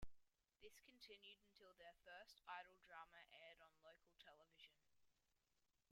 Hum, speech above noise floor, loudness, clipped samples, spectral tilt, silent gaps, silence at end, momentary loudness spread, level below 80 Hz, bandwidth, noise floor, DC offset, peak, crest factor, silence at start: none; 24 dB; -64 LUFS; under 0.1%; -2.5 dB/octave; none; 0 s; 11 LU; -78 dBFS; 16 kHz; -89 dBFS; under 0.1%; -42 dBFS; 22 dB; 0 s